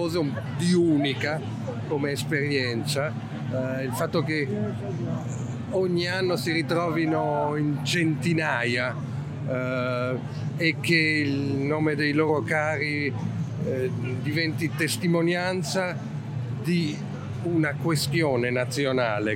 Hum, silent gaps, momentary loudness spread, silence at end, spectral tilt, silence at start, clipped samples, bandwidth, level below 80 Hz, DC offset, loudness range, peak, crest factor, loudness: none; none; 8 LU; 0 s; -5.5 dB/octave; 0 s; under 0.1%; 16 kHz; -60 dBFS; under 0.1%; 3 LU; -6 dBFS; 18 dB; -26 LUFS